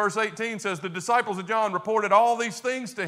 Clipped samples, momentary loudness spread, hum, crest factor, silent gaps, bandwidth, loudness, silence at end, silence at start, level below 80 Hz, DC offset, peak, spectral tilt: under 0.1%; 9 LU; none; 18 dB; none; 15 kHz; -25 LUFS; 0 s; 0 s; -78 dBFS; under 0.1%; -6 dBFS; -4 dB/octave